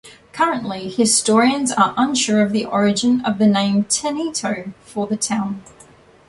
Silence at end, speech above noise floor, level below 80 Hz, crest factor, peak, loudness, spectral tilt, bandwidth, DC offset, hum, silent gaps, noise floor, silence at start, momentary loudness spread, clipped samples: 0.65 s; 29 dB; -58 dBFS; 16 dB; -2 dBFS; -18 LUFS; -3.5 dB/octave; 11.5 kHz; under 0.1%; none; none; -47 dBFS; 0.05 s; 11 LU; under 0.1%